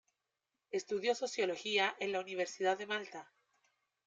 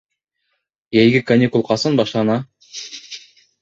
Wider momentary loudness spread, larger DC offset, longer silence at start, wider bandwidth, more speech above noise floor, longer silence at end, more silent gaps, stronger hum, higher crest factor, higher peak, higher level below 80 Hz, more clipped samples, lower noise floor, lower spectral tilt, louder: second, 9 LU vs 19 LU; neither; second, 0.7 s vs 0.9 s; first, 9.2 kHz vs 7.8 kHz; second, 52 dB vs 57 dB; first, 0.85 s vs 0.45 s; neither; neither; about the same, 18 dB vs 18 dB; second, -20 dBFS vs -2 dBFS; second, -88 dBFS vs -56 dBFS; neither; first, -88 dBFS vs -72 dBFS; second, -2.5 dB/octave vs -6 dB/octave; second, -36 LUFS vs -16 LUFS